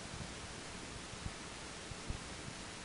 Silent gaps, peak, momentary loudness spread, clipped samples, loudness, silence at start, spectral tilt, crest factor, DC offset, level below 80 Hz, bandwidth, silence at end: none; -26 dBFS; 1 LU; under 0.1%; -46 LUFS; 0 s; -3 dB/octave; 20 dB; under 0.1%; -56 dBFS; 10.5 kHz; 0 s